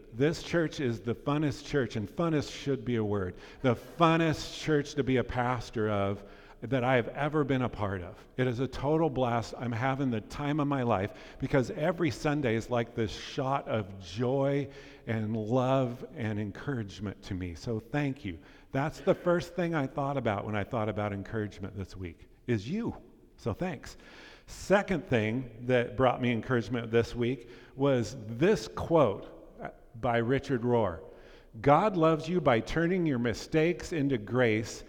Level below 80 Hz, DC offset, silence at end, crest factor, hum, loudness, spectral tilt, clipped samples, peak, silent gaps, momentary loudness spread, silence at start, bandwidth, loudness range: -52 dBFS; under 0.1%; 0 s; 22 dB; none; -30 LUFS; -6.5 dB/octave; under 0.1%; -8 dBFS; none; 13 LU; 0 s; 16 kHz; 6 LU